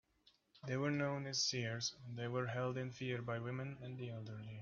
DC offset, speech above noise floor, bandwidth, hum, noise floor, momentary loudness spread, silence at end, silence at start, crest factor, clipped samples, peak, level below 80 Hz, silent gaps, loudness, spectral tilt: under 0.1%; 32 dB; 7.2 kHz; none; -74 dBFS; 10 LU; 0 s; 0.55 s; 18 dB; under 0.1%; -26 dBFS; -76 dBFS; none; -42 LUFS; -4.5 dB/octave